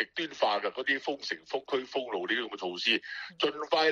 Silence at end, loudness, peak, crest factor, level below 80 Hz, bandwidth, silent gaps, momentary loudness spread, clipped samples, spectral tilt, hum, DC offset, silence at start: 0 s; -31 LUFS; -12 dBFS; 18 dB; -78 dBFS; 11 kHz; none; 7 LU; under 0.1%; -2.5 dB/octave; none; under 0.1%; 0 s